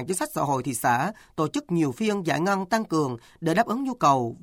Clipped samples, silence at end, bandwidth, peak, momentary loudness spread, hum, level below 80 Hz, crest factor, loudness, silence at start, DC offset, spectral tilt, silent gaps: under 0.1%; 0.05 s; 18.5 kHz; -8 dBFS; 6 LU; none; -62 dBFS; 16 dB; -25 LUFS; 0 s; under 0.1%; -5 dB/octave; none